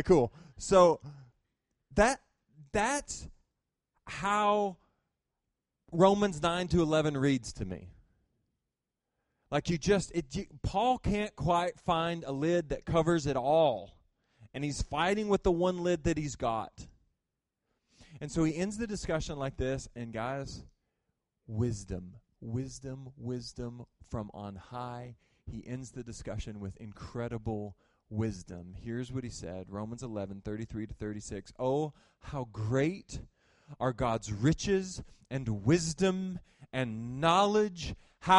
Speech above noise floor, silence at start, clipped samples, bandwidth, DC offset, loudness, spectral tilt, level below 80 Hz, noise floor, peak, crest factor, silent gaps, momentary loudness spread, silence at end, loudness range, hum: 56 dB; 0 s; under 0.1%; 11.5 kHz; under 0.1%; -32 LUFS; -5.5 dB/octave; -50 dBFS; -88 dBFS; -10 dBFS; 22 dB; none; 16 LU; 0 s; 11 LU; none